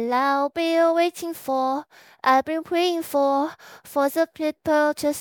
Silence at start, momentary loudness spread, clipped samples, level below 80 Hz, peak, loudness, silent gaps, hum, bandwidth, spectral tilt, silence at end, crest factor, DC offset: 0 s; 7 LU; under 0.1%; -66 dBFS; -6 dBFS; -23 LUFS; none; none; 19.5 kHz; -3 dB/octave; 0 s; 16 dB; under 0.1%